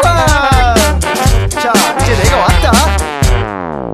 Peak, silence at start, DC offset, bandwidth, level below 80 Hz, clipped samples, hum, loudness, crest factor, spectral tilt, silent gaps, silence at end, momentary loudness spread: 0 dBFS; 0 s; under 0.1%; 14.5 kHz; -16 dBFS; 0.2%; none; -11 LUFS; 10 dB; -4.5 dB/octave; none; 0 s; 4 LU